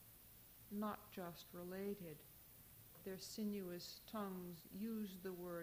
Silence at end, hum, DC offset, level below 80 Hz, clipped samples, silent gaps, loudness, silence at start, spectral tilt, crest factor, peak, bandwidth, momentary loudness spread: 0 s; none; under 0.1%; -76 dBFS; under 0.1%; none; -50 LUFS; 0 s; -5.5 dB/octave; 16 dB; -34 dBFS; over 20 kHz; 14 LU